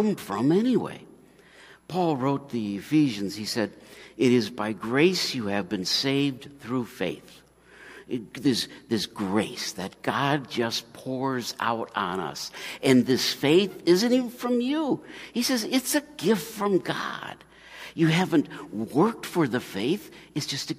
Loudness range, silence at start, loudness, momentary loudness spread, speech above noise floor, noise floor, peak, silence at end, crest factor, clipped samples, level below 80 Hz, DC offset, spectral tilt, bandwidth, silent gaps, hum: 5 LU; 0 s; -26 LUFS; 13 LU; 27 dB; -53 dBFS; -6 dBFS; 0 s; 20 dB; under 0.1%; -66 dBFS; under 0.1%; -4.5 dB/octave; 15.5 kHz; none; none